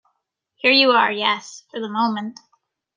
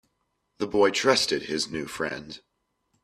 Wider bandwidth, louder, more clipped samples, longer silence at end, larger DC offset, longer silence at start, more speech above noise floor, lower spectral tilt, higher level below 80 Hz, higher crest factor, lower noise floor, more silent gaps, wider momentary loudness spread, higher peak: second, 9.6 kHz vs 14 kHz; first, -18 LUFS vs -25 LUFS; neither; about the same, 0.65 s vs 0.65 s; neither; about the same, 0.65 s vs 0.6 s; first, 55 dB vs 50 dB; about the same, -3.5 dB/octave vs -3 dB/octave; second, -74 dBFS vs -62 dBFS; second, 18 dB vs 24 dB; about the same, -74 dBFS vs -76 dBFS; neither; about the same, 18 LU vs 16 LU; about the same, -2 dBFS vs -4 dBFS